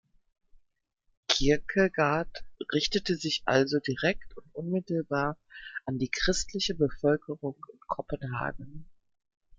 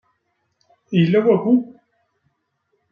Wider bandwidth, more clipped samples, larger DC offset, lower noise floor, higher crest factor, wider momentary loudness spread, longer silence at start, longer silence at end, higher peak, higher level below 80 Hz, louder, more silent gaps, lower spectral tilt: first, 9.6 kHz vs 5.2 kHz; neither; neither; second, -60 dBFS vs -71 dBFS; about the same, 22 dB vs 18 dB; first, 15 LU vs 7 LU; second, 0.55 s vs 0.9 s; second, 0.65 s vs 1.3 s; second, -8 dBFS vs -4 dBFS; first, -48 dBFS vs -66 dBFS; second, -29 LUFS vs -17 LUFS; first, 1.17-1.23 s vs none; second, -4.5 dB/octave vs -9.5 dB/octave